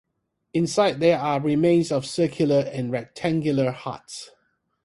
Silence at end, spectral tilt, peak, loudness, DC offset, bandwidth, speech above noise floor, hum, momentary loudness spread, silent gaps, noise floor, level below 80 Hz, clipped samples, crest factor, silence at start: 0.6 s; -6 dB/octave; -6 dBFS; -23 LUFS; under 0.1%; 11.5 kHz; 54 dB; none; 14 LU; none; -76 dBFS; -60 dBFS; under 0.1%; 18 dB; 0.55 s